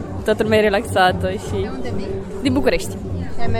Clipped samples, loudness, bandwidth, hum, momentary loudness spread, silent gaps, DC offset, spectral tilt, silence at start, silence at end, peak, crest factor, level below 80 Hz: under 0.1%; -20 LUFS; 17 kHz; none; 11 LU; none; under 0.1%; -5.5 dB/octave; 0 s; 0 s; -2 dBFS; 16 dB; -34 dBFS